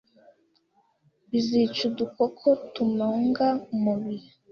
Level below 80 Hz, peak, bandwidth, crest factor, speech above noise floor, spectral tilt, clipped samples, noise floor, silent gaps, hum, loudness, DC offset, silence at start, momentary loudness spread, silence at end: -68 dBFS; -10 dBFS; 6.8 kHz; 16 dB; 42 dB; -6.5 dB/octave; under 0.1%; -67 dBFS; none; none; -26 LUFS; under 0.1%; 1.3 s; 6 LU; 0.3 s